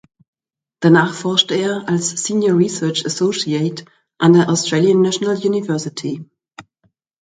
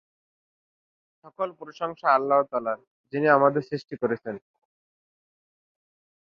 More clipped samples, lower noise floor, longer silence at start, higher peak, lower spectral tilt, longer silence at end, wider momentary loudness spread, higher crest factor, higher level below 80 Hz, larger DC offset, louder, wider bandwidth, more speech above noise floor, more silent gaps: neither; second, -64 dBFS vs under -90 dBFS; second, 0.8 s vs 1.25 s; first, 0 dBFS vs -6 dBFS; second, -4.5 dB/octave vs -8 dB/octave; second, 0.6 s vs 1.85 s; second, 10 LU vs 14 LU; second, 16 dB vs 22 dB; first, -62 dBFS vs -74 dBFS; neither; first, -16 LUFS vs -25 LUFS; first, 9.4 kHz vs 6.6 kHz; second, 48 dB vs over 65 dB; second, none vs 2.87-3.04 s